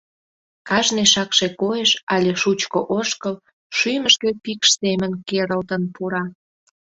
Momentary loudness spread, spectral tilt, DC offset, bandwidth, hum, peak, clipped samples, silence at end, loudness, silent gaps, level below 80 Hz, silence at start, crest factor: 10 LU; -2.5 dB/octave; under 0.1%; 8.2 kHz; none; -2 dBFS; under 0.1%; 0.55 s; -19 LUFS; 2.03-2.07 s, 3.53-3.70 s; -60 dBFS; 0.65 s; 20 dB